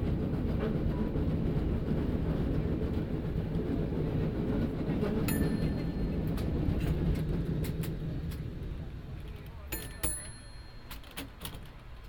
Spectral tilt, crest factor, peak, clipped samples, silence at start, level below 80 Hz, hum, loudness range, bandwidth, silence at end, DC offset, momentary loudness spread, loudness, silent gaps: -7 dB/octave; 16 dB; -16 dBFS; under 0.1%; 0 s; -38 dBFS; none; 7 LU; 19 kHz; 0 s; under 0.1%; 12 LU; -34 LUFS; none